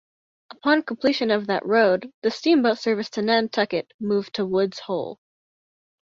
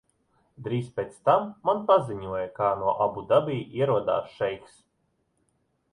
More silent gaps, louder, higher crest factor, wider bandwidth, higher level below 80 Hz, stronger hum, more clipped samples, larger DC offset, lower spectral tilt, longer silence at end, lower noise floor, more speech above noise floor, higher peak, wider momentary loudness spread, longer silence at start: first, 2.14-2.22 s, 3.94-3.99 s vs none; first, -22 LUFS vs -26 LUFS; about the same, 18 dB vs 20 dB; second, 7.6 kHz vs 11 kHz; second, -68 dBFS vs -62 dBFS; neither; neither; neither; second, -5.5 dB/octave vs -7.5 dB/octave; second, 0.95 s vs 1.35 s; first, under -90 dBFS vs -73 dBFS; first, over 68 dB vs 47 dB; about the same, -6 dBFS vs -8 dBFS; about the same, 9 LU vs 9 LU; about the same, 0.65 s vs 0.6 s